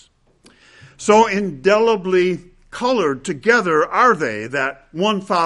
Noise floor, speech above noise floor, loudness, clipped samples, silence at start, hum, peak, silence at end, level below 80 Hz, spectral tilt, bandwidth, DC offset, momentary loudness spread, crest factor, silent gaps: -53 dBFS; 36 dB; -17 LUFS; under 0.1%; 1 s; none; 0 dBFS; 0 s; -52 dBFS; -4.5 dB/octave; 11.5 kHz; under 0.1%; 9 LU; 18 dB; none